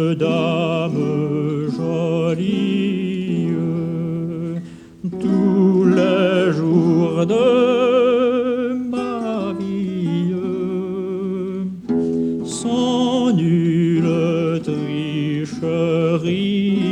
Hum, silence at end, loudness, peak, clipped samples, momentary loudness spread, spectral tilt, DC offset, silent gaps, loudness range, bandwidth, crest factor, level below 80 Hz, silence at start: none; 0 s; -19 LUFS; -4 dBFS; under 0.1%; 9 LU; -7 dB/octave; under 0.1%; none; 6 LU; 9.8 kHz; 14 dB; -56 dBFS; 0 s